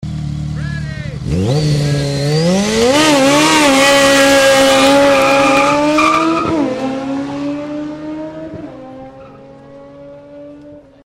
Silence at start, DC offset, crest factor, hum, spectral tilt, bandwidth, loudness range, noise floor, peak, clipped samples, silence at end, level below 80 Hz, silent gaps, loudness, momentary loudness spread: 0 s; under 0.1%; 12 dB; none; -4 dB/octave; 16.5 kHz; 17 LU; -37 dBFS; -2 dBFS; under 0.1%; 0.3 s; -36 dBFS; none; -11 LUFS; 17 LU